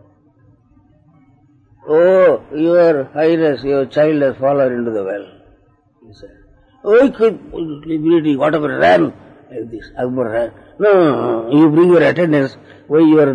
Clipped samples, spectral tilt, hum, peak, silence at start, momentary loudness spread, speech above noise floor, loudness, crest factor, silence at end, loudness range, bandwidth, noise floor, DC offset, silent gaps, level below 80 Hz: under 0.1%; -8 dB/octave; none; -2 dBFS; 1.85 s; 15 LU; 39 dB; -14 LUFS; 12 dB; 0 s; 5 LU; 9.4 kHz; -53 dBFS; under 0.1%; none; -52 dBFS